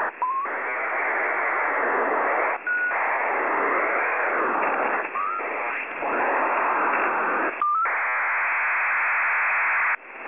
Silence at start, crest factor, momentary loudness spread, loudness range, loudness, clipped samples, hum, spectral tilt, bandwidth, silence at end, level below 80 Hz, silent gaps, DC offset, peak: 0 s; 12 dB; 6 LU; 2 LU; -23 LUFS; under 0.1%; none; -1 dB/octave; 3.7 kHz; 0 s; -74 dBFS; none; 0.2%; -12 dBFS